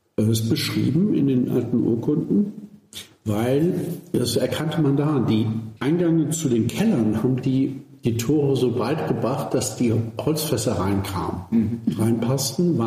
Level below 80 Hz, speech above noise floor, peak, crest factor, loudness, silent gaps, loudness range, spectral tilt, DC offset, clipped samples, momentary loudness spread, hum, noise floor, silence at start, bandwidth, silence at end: -54 dBFS; 21 dB; -10 dBFS; 12 dB; -22 LUFS; none; 2 LU; -6 dB/octave; under 0.1%; under 0.1%; 6 LU; none; -42 dBFS; 0.2 s; 15.5 kHz; 0 s